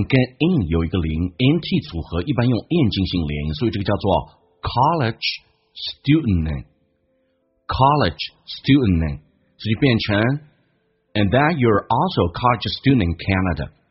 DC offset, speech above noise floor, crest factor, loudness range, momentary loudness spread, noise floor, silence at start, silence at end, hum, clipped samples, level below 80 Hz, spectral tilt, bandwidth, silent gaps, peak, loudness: under 0.1%; 47 dB; 18 dB; 3 LU; 11 LU; -66 dBFS; 0 s; 0.25 s; none; under 0.1%; -36 dBFS; -5.5 dB/octave; 6 kHz; none; -2 dBFS; -20 LUFS